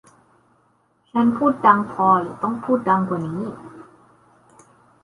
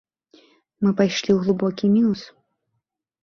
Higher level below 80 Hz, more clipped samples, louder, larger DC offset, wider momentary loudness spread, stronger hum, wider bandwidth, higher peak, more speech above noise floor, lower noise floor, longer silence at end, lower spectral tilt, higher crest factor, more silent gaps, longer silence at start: about the same, -62 dBFS vs -62 dBFS; neither; about the same, -19 LUFS vs -21 LUFS; neither; first, 12 LU vs 5 LU; neither; first, 11 kHz vs 7 kHz; first, -2 dBFS vs -6 dBFS; second, 43 dB vs 58 dB; second, -62 dBFS vs -77 dBFS; first, 1.2 s vs 1 s; first, -8.5 dB/octave vs -6.5 dB/octave; about the same, 20 dB vs 18 dB; neither; first, 1.15 s vs 0.8 s